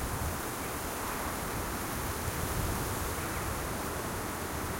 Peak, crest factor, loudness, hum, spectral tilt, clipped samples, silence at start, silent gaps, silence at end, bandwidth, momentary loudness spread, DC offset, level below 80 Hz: -20 dBFS; 14 dB; -35 LUFS; none; -4 dB/octave; under 0.1%; 0 s; none; 0 s; 16.5 kHz; 2 LU; under 0.1%; -44 dBFS